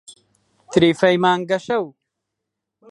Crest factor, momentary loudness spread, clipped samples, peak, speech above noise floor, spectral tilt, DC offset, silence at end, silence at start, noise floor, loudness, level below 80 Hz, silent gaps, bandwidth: 20 dB; 9 LU; under 0.1%; -2 dBFS; 64 dB; -5.5 dB/octave; under 0.1%; 1 s; 0.1 s; -81 dBFS; -18 LUFS; -58 dBFS; none; 11.5 kHz